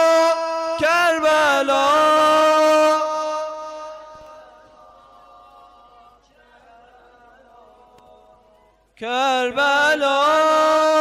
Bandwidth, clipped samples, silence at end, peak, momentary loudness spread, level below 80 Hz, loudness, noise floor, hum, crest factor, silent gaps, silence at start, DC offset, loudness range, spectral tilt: 15.5 kHz; under 0.1%; 0 s; -10 dBFS; 15 LU; -60 dBFS; -17 LUFS; -56 dBFS; none; 10 dB; none; 0 s; under 0.1%; 17 LU; -2 dB/octave